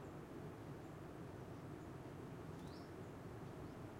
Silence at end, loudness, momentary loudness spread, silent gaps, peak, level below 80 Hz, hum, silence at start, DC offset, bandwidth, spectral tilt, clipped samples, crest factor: 0 s; -53 LUFS; 1 LU; none; -40 dBFS; -68 dBFS; none; 0 s; under 0.1%; 16 kHz; -7 dB/octave; under 0.1%; 14 dB